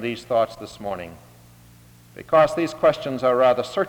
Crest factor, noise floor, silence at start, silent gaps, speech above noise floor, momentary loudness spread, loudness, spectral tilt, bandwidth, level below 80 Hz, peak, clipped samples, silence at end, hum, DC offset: 18 dB; -49 dBFS; 0 s; none; 28 dB; 15 LU; -21 LUFS; -5.5 dB/octave; 19.5 kHz; -56 dBFS; -4 dBFS; under 0.1%; 0 s; none; under 0.1%